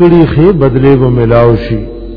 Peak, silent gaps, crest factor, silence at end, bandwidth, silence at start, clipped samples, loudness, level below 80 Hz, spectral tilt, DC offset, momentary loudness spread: 0 dBFS; none; 6 dB; 0 s; 5.4 kHz; 0 s; 4%; -8 LUFS; -22 dBFS; -11 dB/octave; under 0.1%; 8 LU